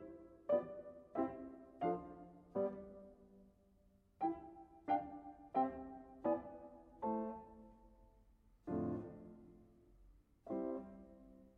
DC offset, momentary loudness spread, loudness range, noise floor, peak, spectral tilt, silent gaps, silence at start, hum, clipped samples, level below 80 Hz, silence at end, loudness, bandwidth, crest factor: under 0.1%; 20 LU; 5 LU; -72 dBFS; -24 dBFS; -9.5 dB/octave; none; 0 s; none; under 0.1%; -70 dBFS; 0.1 s; -44 LUFS; 4.5 kHz; 22 dB